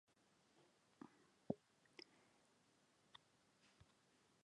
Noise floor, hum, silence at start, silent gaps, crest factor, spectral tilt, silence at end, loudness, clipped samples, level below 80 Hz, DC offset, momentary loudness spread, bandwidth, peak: -78 dBFS; none; 0.6 s; none; 36 dB; -6 dB/octave; 0.6 s; -58 LUFS; under 0.1%; -88 dBFS; under 0.1%; 16 LU; 10.5 kHz; -26 dBFS